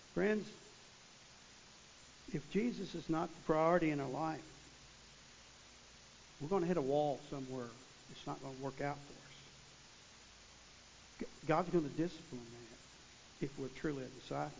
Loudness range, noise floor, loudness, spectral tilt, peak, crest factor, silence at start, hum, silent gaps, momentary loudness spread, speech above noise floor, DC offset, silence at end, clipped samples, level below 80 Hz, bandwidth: 9 LU; -60 dBFS; -40 LUFS; -6 dB/octave; -18 dBFS; 22 dB; 0 s; none; none; 23 LU; 22 dB; under 0.1%; 0 s; under 0.1%; -68 dBFS; 7.6 kHz